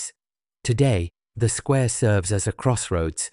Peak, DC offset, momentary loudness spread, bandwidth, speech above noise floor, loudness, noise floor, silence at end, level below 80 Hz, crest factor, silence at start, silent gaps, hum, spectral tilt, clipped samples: -6 dBFS; under 0.1%; 8 LU; 11.5 kHz; 68 dB; -23 LUFS; -90 dBFS; 0.05 s; -42 dBFS; 16 dB; 0 s; none; none; -5.5 dB/octave; under 0.1%